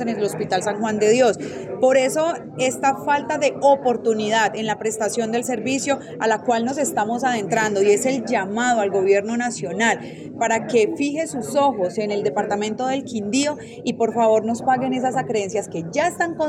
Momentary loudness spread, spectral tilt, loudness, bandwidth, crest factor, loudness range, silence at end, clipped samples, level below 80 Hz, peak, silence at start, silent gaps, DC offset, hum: 7 LU; -4 dB/octave; -21 LUFS; 15.5 kHz; 16 dB; 2 LU; 0 s; under 0.1%; -64 dBFS; -4 dBFS; 0 s; none; under 0.1%; none